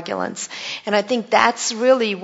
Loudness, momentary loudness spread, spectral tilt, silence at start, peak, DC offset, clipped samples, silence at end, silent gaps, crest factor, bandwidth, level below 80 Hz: -19 LUFS; 11 LU; -2.5 dB/octave; 0 s; 0 dBFS; under 0.1%; under 0.1%; 0 s; none; 20 dB; 8 kHz; -68 dBFS